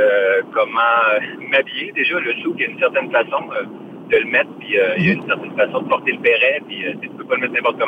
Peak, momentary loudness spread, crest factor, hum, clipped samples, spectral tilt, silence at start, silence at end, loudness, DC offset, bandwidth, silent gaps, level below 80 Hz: -4 dBFS; 10 LU; 14 dB; none; under 0.1%; -7 dB/octave; 0 s; 0 s; -17 LUFS; under 0.1%; 5.2 kHz; none; -62 dBFS